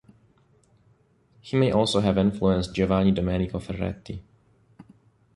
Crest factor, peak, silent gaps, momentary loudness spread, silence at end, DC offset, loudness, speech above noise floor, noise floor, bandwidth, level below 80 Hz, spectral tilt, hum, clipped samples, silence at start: 20 dB; -6 dBFS; none; 11 LU; 0.55 s; under 0.1%; -24 LUFS; 39 dB; -62 dBFS; 11.5 kHz; -44 dBFS; -7 dB/octave; none; under 0.1%; 1.45 s